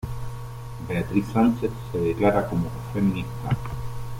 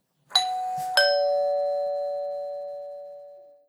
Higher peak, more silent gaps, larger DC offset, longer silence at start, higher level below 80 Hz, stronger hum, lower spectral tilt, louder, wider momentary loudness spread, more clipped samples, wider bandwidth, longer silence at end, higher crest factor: about the same, -8 dBFS vs -6 dBFS; neither; neither; second, 0 s vs 0.3 s; first, -42 dBFS vs -74 dBFS; neither; first, -8 dB/octave vs 0.5 dB/octave; about the same, -25 LUFS vs -25 LUFS; second, 14 LU vs 18 LU; neither; second, 16.5 kHz vs 19.5 kHz; second, 0 s vs 0.2 s; about the same, 18 dB vs 22 dB